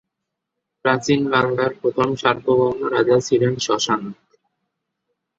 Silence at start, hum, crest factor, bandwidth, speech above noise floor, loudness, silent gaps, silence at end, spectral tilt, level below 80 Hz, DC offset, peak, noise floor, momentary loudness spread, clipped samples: 0.85 s; none; 20 dB; 7.8 kHz; 62 dB; -19 LUFS; none; 1.25 s; -5 dB/octave; -58 dBFS; under 0.1%; -2 dBFS; -80 dBFS; 4 LU; under 0.1%